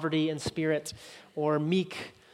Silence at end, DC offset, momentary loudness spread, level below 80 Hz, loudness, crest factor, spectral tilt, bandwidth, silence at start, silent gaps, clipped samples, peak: 0.2 s; under 0.1%; 14 LU; -64 dBFS; -30 LUFS; 16 dB; -5.5 dB/octave; 14 kHz; 0 s; none; under 0.1%; -16 dBFS